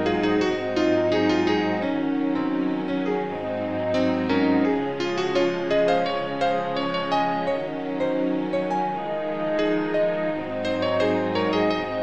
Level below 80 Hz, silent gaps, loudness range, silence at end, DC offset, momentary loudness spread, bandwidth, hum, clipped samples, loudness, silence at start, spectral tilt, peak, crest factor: -56 dBFS; none; 2 LU; 0 s; 0.4%; 6 LU; 8.4 kHz; none; under 0.1%; -24 LUFS; 0 s; -6.5 dB/octave; -8 dBFS; 14 dB